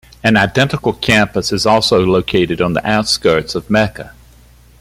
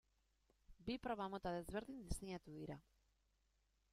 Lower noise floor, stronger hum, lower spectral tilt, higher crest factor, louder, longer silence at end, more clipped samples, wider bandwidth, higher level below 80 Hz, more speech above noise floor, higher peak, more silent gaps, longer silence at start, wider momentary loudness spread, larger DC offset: second, -44 dBFS vs -82 dBFS; neither; about the same, -4.5 dB/octave vs -5.5 dB/octave; second, 14 dB vs 22 dB; first, -14 LUFS vs -49 LUFS; second, 0.7 s vs 1.1 s; neither; about the same, 15.5 kHz vs 15 kHz; first, -40 dBFS vs -62 dBFS; second, 30 dB vs 34 dB; first, 0 dBFS vs -30 dBFS; neither; second, 0.25 s vs 0.7 s; second, 4 LU vs 9 LU; neither